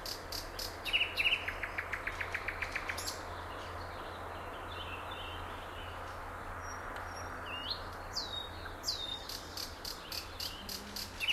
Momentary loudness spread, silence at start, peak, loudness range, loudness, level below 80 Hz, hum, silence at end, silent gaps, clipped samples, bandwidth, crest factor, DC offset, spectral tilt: 11 LU; 0 s; -18 dBFS; 8 LU; -38 LUFS; -52 dBFS; none; 0 s; none; under 0.1%; 16 kHz; 22 dB; under 0.1%; -2 dB/octave